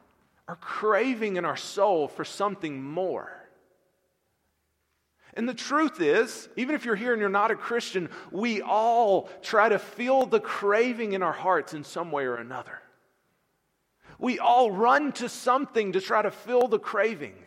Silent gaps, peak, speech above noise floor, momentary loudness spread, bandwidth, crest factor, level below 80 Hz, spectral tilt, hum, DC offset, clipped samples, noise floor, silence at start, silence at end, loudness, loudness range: none; -6 dBFS; 49 dB; 13 LU; 15 kHz; 22 dB; -78 dBFS; -4.5 dB/octave; none; under 0.1%; under 0.1%; -75 dBFS; 0.5 s; 0.15 s; -26 LUFS; 8 LU